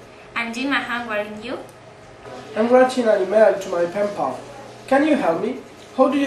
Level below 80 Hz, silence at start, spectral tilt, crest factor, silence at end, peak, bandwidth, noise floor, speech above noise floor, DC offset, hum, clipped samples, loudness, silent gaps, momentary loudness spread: -60 dBFS; 0 s; -5 dB/octave; 18 dB; 0 s; -2 dBFS; 12.5 kHz; -42 dBFS; 23 dB; under 0.1%; none; under 0.1%; -20 LUFS; none; 19 LU